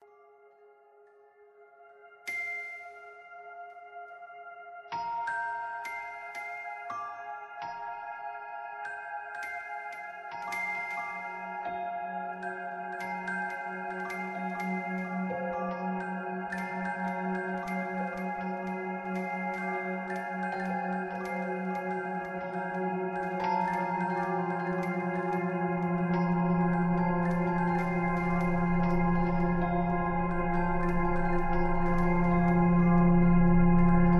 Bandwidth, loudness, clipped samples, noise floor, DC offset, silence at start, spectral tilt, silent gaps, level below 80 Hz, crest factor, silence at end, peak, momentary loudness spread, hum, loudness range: 6.6 kHz; -31 LUFS; under 0.1%; -59 dBFS; under 0.1%; 1.6 s; -8.5 dB/octave; none; -40 dBFS; 18 dB; 0 s; -12 dBFS; 14 LU; none; 11 LU